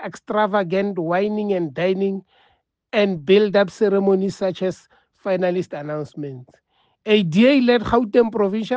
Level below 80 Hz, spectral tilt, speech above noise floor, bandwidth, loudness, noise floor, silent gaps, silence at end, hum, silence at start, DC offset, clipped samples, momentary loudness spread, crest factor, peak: -52 dBFS; -7 dB/octave; 44 dB; 8.4 kHz; -19 LUFS; -63 dBFS; none; 0 s; none; 0 s; under 0.1%; under 0.1%; 15 LU; 16 dB; -4 dBFS